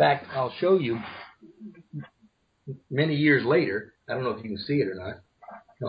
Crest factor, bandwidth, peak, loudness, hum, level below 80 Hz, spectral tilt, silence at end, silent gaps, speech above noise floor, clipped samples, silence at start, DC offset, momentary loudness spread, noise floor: 18 dB; 5.2 kHz; -8 dBFS; -26 LUFS; none; -62 dBFS; -9.5 dB/octave; 0 s; none; 39 dB; under 0.1%; 0 s; under 0.1%; 25 LU; -64 dBFS